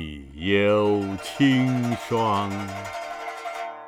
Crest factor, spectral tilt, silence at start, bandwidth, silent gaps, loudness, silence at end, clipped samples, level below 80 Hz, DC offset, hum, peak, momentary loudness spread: 16 dB; -6 dB/octave; 0 s; 15.5 kHz; none; -24 LUFS; 0 s; under 0.1%; -52 dBFS; under 0.1%; none; -8 dBFS; 13 LU